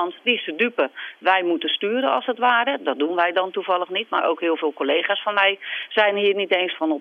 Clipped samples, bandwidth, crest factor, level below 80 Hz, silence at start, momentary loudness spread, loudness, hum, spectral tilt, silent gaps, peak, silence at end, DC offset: under 0.1%; 5.8 kHz; 18 dB; -86 dBFS; 0 s; 5 LU; -21 LUFS; none; -5.5 dB/octave; none; -4 dBFS; 0 s; under 0.1%